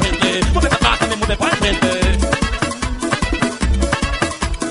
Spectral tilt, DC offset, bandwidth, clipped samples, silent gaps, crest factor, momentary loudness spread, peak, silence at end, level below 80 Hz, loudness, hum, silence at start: -4 dB/octave; under 0.1%; 11.5 kHz; under 0.1%; none; 16 dB; 6 LU; 0 dBFS; 0 s; -22 dBFS; -17 LUFS; none; 0 s